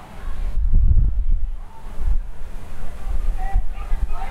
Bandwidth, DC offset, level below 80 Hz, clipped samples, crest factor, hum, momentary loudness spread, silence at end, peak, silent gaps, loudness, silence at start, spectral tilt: 3.5 kHz; under 0.1%; -20 dBFS; under 0.1%; 12 dB; none; 18 LU; 0 s; -6 dBFS; none; -26 LUFS; 0 s; -7.5 dB/octave